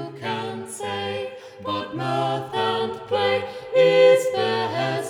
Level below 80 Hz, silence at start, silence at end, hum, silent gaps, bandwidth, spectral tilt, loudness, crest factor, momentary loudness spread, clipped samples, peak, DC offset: -68 dBFS; 0 s; 0 s; none; none; 15 kHz; -4.5 dB/octave; -22 LUFS; 16 dB; 14 LU; under 0.1%; -6 dBFS; under 0.1%